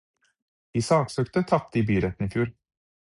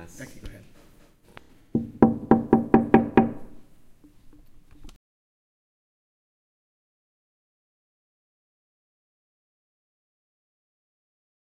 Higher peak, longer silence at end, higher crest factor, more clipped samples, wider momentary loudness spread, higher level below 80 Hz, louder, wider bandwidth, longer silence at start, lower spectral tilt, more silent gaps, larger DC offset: second, -8 dBFS vs -2 dBFS; second, 0.5 s vs 6.55 s; second, 20 dB vs 28 dB; neither; second, 7 LU vs 23 LU; about the same, -48 dBFS vs -52 dBFS; second, -26 LUFS vs -22 LUFS; first, 11.5 kHz vs 8 kHz; first, 0.75 s vs 0 s; second, -6.5 dB/octave vs -8.5 dB/octave; neither; neither